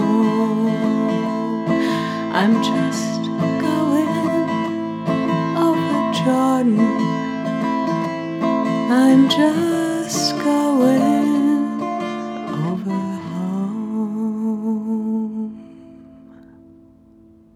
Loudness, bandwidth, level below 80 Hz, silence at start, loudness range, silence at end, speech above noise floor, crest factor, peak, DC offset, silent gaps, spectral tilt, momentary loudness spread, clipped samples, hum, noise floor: -19 LUFS; 15.5 kHz; -66 dBFS; 0 s; 8 LU; 1.2 s; 31 dB; 16 dB; -2 dBFS; under 0.1%; none; -5.5 dB/octave; 9 LU; under 0.1%; none; -48 dBFS